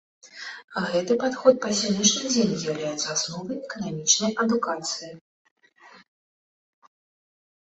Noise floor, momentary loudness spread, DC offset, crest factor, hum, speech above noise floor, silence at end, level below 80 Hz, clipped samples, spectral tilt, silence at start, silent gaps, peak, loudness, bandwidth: -53 dBFS; 13 LU; under 0.1%; 22 dB; none; 28 dB; 1.75 s; -66 dBFS; under 0.1%; -3 dB/octave; 0.25 s; 0.64-0.68 s, 5.21-5.45 s, 5.51-5.56 s; -4 dBFS; -24 LUFS; 8.4 kHz